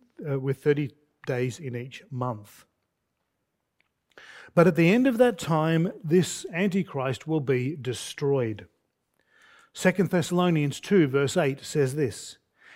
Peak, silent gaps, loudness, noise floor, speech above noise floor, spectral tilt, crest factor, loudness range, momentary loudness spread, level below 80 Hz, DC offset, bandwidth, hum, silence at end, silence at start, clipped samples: -4 dBFS; none; -25 LUFS; -79 dBFS; 54 dB; -6 dB/octave; 22 dB; 9 LU; 14 LU; -68 dBFS; under 0.1%; 16 kHz; none; 0.45 s; 0.2 s; under 0.1%